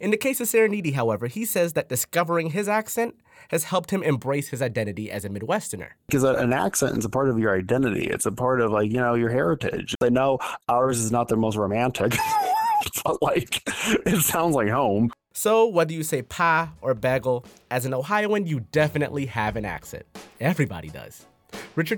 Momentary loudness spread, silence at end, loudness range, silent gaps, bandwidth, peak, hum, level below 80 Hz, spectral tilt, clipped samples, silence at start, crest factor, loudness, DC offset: 8 LU; 0 s; 4 LU; none; 19 kHz; -6 dBFS; none; -52 dBFS; -5 dB/octave; under 0.1%; 0 s; 18 dB; -24 LUFS; under 0.1%